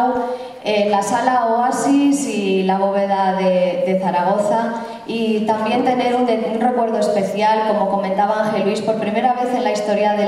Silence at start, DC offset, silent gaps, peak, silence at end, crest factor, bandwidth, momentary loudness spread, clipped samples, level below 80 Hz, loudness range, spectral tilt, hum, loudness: 0 s; under 0.1%; none; -2 dBFS; 0 s; 16 dB; 13.5 kHz; 4 LU; under 0.1%; -60 dBFS; 1 LU; -5.5 dB/octave; none; -18 LUFS